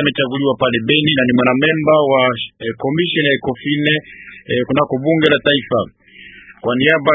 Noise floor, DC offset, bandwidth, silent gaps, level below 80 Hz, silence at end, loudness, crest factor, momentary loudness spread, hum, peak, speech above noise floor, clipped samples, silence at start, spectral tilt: -40 dBFS; under 0.1%; 3.9 kHz; none; -50 dBFS; 0 s; -15 LUFS; 16 dB; 9 LU; none; 0 dBFS; 25 dB; under 0.1%; 0 s; -8 dB/octave